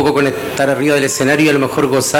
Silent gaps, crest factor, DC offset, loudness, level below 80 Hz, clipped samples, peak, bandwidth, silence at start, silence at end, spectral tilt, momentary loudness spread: none; 10 dB; under 0.1%; -13 LUFS; -50 dBFS; under 0.1%; -4 dBFS; 17 kHz; 0 s; 0 s; -4 dB/octave; 4 LU